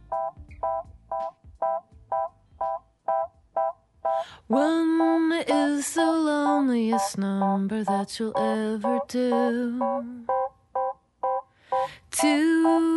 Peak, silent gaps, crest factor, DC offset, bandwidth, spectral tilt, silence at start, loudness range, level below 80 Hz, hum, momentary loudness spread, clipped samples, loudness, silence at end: -10 dBFS; none; 16 dB; under 0.1%; 11.5 kHz; -5 dB/octave; 0.1 s; 7 LU; -60 dBFS; none; 11 LU; under 0.1%; -26 LUFS; 0 s